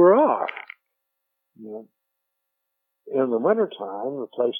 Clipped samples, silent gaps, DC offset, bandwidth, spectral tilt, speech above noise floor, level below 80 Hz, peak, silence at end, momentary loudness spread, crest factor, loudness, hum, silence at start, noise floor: under 0.1%; none; under 0.1%; 3.7 kHz; -9.5 dB/octave; 56 dB; under -90 dBFS; -4 dBFS; 0 s; 20 LU; 20 dB; -23 LUFS; 60 Hz at -60 dBFS; 0 s; -80 dBFS